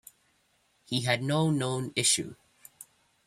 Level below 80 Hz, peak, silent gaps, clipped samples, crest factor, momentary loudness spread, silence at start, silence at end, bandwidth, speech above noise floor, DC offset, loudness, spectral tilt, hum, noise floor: -68 dBFS; -10 dBFS; none; under 0.1%; 22 dB; 19 LU; 0.9 s; 0.45 s; 15.5 kHz; 42 dB; under 0.1%; -27 LUFS; -3.5 dB/octave; none; -70 dBFS